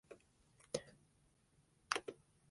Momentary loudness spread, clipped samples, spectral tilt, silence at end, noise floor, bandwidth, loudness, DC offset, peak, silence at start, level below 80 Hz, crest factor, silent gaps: 22 LU; under 0.1%; -2 dB/octave; 0.35 s; -75 dBFS; 11.5 kHz; -45 LUFS; under 0.1%; -18 dBFS; 0.1 s; -80 dBFS; 34 dB; none